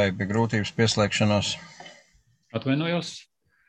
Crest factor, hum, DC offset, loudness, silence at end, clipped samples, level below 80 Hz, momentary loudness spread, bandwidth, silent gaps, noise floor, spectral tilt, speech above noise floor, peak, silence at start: 18 dB; none; under 0.1%; -25 LUFS; 0.45 s; under 0.1%; -52 dBFS; 17 LU; 9.4 kHz; none; -63 dBFS; -5 dB/octave; 38 dB; -8 dBFS; 0 s